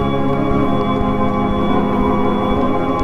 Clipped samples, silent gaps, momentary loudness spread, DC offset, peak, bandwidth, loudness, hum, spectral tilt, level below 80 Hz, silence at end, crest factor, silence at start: under 0.1%; none; 1 LU; under 0.1%; -2 dBFS; 8 kHz; -17 LUFS; none; -8.5 dB/octave; -30 dBFS; 0 s; 12 dB; 0 s